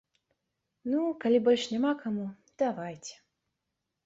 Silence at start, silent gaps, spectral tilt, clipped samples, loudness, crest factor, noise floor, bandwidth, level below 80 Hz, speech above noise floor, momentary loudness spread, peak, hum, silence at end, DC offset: 0.85 s; none; -5 dB/octave; under 0.1%; -29 LUFS; 18 dB; -85 dBFS; 8 kHz; -76 dBFS; 56 dB; 16 LU; -14 dBFS; none; 0.95 s; under 0.1%